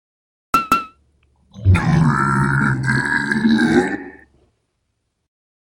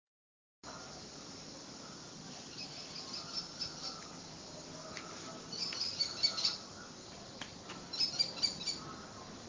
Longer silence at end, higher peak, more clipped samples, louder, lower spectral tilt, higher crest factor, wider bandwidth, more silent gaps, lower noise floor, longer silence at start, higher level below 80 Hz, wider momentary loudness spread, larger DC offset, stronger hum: first, 1.65 s vs 0 s; first, 0 dBFS vs -18 dBFS; neither; first, -17 LUFS vs -39 LUFS; first, -6.5 dB/octave vs -1.5 dB/octave; second, 18 dB vs 24 dB; first, 17 kHz vs 7.8 kHz; neither; second, -71 dBFS vs under -90 dBFS; about the same, 0.55 s vs 0.65 s; first, -38 dBFS vs -68 dBFS; second, 8 LU vs 16 LU; neither; neither